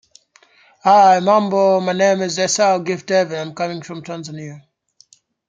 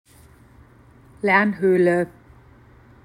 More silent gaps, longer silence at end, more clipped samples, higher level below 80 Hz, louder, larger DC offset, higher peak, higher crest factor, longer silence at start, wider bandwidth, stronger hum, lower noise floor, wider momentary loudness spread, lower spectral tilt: neither; about the same, 0.9 s vs 0.95 s; neither; second, -68 dBFS vs -56 dBFS; first, -16 LUFS vs -19 LUFS; neither; about the same, -2 dBFS vs -2 dBFS; about the same, 16 dB vs 20 dB; second, 0.85 s vs 1.25 s; second, 9.4 kHz vs 11 kHz; neither; about the same, -53 dBFS vs -50 dBFS; first, 18 LU vs 9 LU; second, -4 dB/octave vs -7.5 dB/octave